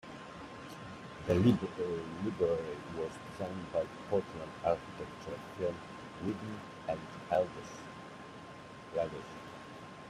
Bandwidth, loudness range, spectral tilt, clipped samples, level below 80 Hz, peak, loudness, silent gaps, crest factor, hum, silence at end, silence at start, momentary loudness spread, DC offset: 14 kHz; 5 LU; -7 dB/octave; under 0.1%; -64 dBFS; -16 dBFS; -37 LUFS; none; 22 dB; none; 0 s; 0.05 s; 15 LU; under 0.1%